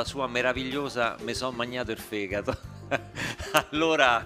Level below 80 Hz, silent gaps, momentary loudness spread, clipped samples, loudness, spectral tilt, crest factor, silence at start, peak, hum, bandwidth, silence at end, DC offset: -50 dBFS; none; 9 LU; under 0.1%; -28 LUFS; -4 dB/octave; 26 dB; 0 s; -2 dBFS; none; 15.5 kHz; 0 s; under 0.1%